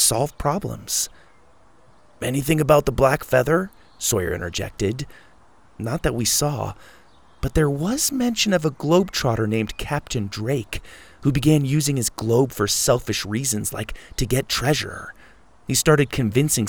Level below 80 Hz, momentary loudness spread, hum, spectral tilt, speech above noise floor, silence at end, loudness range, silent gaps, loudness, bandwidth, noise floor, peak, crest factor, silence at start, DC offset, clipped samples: -40 dBFS; 12 LU; none; -4.5 dB/octave; 34 dB; 0 s; 3 LU; none; -21 LUFS; over 20 kHz; -55 dBFS; -2 dBFS; 20 dB; 0 s; 0.3%; under 0.1%